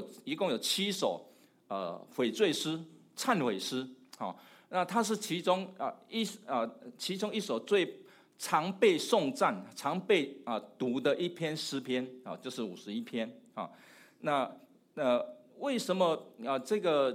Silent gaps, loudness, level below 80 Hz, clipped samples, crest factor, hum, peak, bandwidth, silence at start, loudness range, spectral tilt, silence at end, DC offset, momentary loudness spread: none; -33 LUFS; -90 dBFS; under 0.1%; 20 dB; none; -14 dBFS; 16 kHz; 0 s; 6 LU; -4 dB/octave; 0 s; under 0.1%; 12 LU